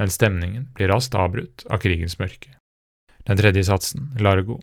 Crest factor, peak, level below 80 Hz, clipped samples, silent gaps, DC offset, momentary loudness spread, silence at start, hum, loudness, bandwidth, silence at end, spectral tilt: 18 dB; -2 dBFS; -46 dBFS; under 0.1%; 2.60-3.07 s; under 0.1%; 12 LU; 0 s; none; -21 LUFS; 16.5 kHz; 0 s; -5.5 dB/octave